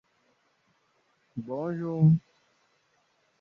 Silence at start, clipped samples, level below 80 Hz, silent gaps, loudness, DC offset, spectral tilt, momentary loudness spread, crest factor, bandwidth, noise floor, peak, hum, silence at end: 1.35 s; under 0.1%; -70 dBFS; none; -27 LUFS; under 0.1%; -11.5 dB/octave; 18 LU; 20 dB; 2.8 kHz; -70 dBFS; -12 dBFS; none; 1.2 s